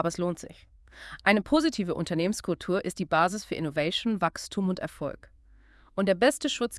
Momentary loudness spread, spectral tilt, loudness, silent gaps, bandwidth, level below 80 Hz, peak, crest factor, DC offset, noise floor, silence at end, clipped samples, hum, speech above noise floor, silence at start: 14 LU; -4.5 dB/octave; -28 LUFS; none; 12 kHz; -56 dBFS; -6 dBFS; 22 dB; under 0.1%; -56 dBFS; 0 s; under 0.1%; none; 29 dB; 0 s